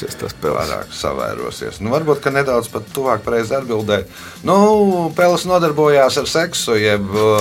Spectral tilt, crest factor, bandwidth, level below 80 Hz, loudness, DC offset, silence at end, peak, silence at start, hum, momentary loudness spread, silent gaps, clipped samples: -4.5 dB/octave; 16 dB; 17 kHz; -44 dBFS; -16 LUFS; under 0.1%; 0 s; 0 dBFS; 0 s; none; 11 LU; none; under 0.1%